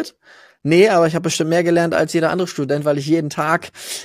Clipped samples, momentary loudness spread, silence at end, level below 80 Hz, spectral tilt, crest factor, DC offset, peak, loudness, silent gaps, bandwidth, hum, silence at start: under 0.1%; 8 LU; 0 s; -60 dBFS; -5 dB/octave; 16 dB; under 0.1%; 0 dBFS; -17 LUFS; none; 15.5 kHz; none; 0 s